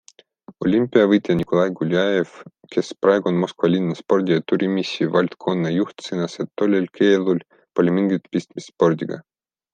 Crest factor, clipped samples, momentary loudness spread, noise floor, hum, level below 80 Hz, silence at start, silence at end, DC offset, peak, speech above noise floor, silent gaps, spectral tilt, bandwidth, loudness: 18 dB; under 0.1%; 9 LU; -47 dBFS; none; -62 dBFS; 0.5 s; 0.55 s; under 0.1%; -2 dBFS; 28 dB; none; -7 dB/octave; 9.2 kHz; -20 LUFS